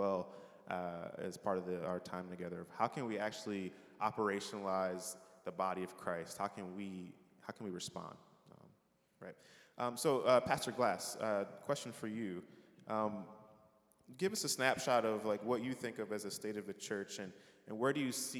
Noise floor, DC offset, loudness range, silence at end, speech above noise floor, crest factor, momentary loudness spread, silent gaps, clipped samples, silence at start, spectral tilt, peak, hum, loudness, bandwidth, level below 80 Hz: -74 dBFS; under 0.1%; 7 LU; 0 s; 35 dB; 24 dB; 16 LU; none; under 0.1%; 0 s; -4 dB/octave; -16 dBFS; none; -40 LUFS; 19 kHz; -80 dBFS